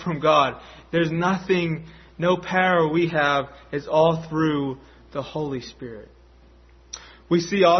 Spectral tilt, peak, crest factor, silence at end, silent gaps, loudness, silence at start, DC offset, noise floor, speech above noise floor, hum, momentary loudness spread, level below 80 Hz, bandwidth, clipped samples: -6 dB/octave; -4 dBFS; 20 dB; 0 s; none; -22 LUFS; 0 s; under 0.1%; -51 dBFS; 29 dB; none; 20 LU; -52 dBFS; 6.4 kHz; under 0.1%